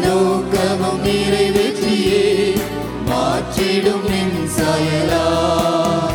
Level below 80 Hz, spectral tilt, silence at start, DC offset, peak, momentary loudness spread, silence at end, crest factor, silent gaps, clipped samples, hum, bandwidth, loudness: -36 dBFS; -5 dB/octave; 0 s; under 0.1%; -2 dBFS; 4 LU; 0 s; 14 dB; none; under 0.1%; none; 19 kHz; -17 LUFS